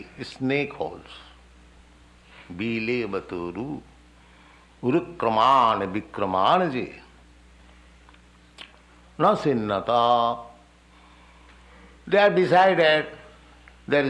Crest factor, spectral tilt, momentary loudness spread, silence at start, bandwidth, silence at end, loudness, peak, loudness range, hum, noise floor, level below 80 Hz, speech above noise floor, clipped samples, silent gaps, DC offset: 18 dB; -6.5 dB/octave; 23 LU; 0 s; 10.5 kHz; 0 s; -23 LUFS; -6 dBFS; 9 LU; 60 Hz at -55 dBFS; -53 dBFS; -56 dBFS; 31 dB; under 0.1%; none; under 0.1%